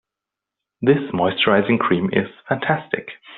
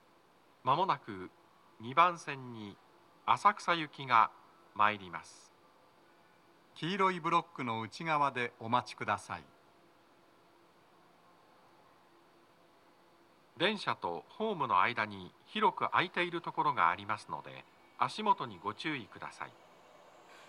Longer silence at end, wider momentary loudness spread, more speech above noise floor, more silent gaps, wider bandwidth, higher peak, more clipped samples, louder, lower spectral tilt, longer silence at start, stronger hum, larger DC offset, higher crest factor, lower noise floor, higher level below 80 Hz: about the same, 0 s vs 0.05 s; second, 8 LU vs 18 LU; first, 66 dB vs 32 dB; neither; second, 4.3 kHz vs 11.5 kHz; first, -2 dBFS vs -12 dBFS; neither; first, -19 LUFS vs -33 LUFS; about the same, -4 dB/octave vs -4.5 dB/octave; first, 0.8 s vs 0.65 s; neither; neither; second, 18 dB vs 24 dB; first, -86 dBFS vs -66 dBFS; first, -58 dBFS vs -84 dBFS